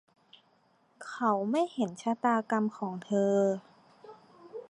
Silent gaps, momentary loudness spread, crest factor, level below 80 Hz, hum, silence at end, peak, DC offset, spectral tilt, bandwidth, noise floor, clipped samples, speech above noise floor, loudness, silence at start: none; 12 LU; 18 dB; -82 dBFS; none; 0.05 s; -14 dBFS; under 0.1%; -6.5 dB/octave; 11 kHz; -68 dBFS; under 0.1%; 39 dB; -30 LUFS; 1 s